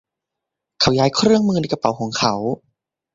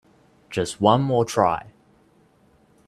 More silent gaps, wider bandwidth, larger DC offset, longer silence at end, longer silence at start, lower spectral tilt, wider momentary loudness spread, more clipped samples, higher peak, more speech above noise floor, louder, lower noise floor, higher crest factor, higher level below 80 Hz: neither; second, 7.8 kHz vs 14 kHz; neither; second, 0.6 s vs 1.2 s; first, 0.8 s vs 0.5 s; about the same, -5 dB/octave vs -6 dB/octave; about the same, 9 LU vs 11 LU; neither; about the same, -2 dBFS vs -2 dBFS; first, 65 dB vs 38 dB; first, -18 LUFS vs -22 LUFS; first, -83 dBFS vs -58 dBFS; about the same, 18 dB vs 22 dB; first, -50 dBFS vs -58 dBFS